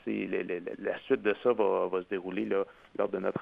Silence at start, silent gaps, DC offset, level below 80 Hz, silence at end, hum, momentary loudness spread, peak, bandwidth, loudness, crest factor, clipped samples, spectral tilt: 0.05 s; none; under 0.1%; -72 dBFS; 0 s; none; 8 LU; -14 dBFS; 4.9 kHz; -31 LUFS; 18 dB; under 0.1%; -8.5 dB/octave